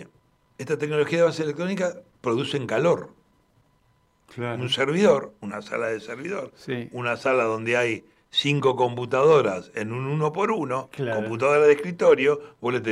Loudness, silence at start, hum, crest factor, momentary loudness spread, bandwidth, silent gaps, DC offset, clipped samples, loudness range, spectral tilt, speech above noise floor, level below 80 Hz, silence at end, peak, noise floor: -24 LUFS; 0 s; none; 16 dB; 13 LU; 11.5 kHz; none; under 0.1%; under 0.1%; 4 LU; -5.5 dB/octave; 41 dB; -68 dBFS; 0 s; -6 dBFS; -64 dBFS